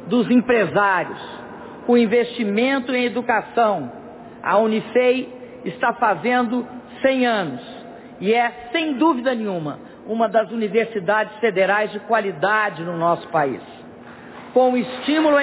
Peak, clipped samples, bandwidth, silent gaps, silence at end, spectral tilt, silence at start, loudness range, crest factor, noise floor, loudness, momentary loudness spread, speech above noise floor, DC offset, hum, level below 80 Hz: -6 dBFS; under 0.1%; 4 kHz; none; 0 s; -9.5 dB/octave; 0 s; 2 LU; 16 dB; -40 dBFS; -20 LUFS; 17 LU; 21 dB; under 0.1%; none; -62 dBFS